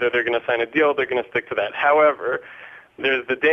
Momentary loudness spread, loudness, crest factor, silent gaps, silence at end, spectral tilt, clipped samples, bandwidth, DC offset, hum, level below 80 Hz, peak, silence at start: 10 LU; -20 LUFS; 16 dB; none; 0 s; -6 dB/octave; under 0.1%; 6.2 kHz; under 0.1%; none; -62 dBFS; -4 dBFS; 0 s